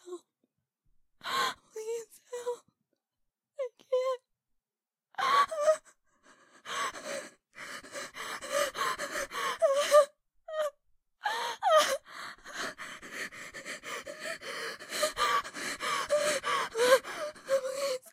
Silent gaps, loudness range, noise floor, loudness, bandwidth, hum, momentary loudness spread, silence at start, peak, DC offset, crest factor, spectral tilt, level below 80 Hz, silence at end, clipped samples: none; 9 LU; under -90 dBFS; -31 LUFS; 16 kHz; none; 17 LU; 0.05 s; -10 dBFS; under 0.1%; 24 dB; -0.5 dB/octave; -72 dBFS; 0.05 s; under 0.1%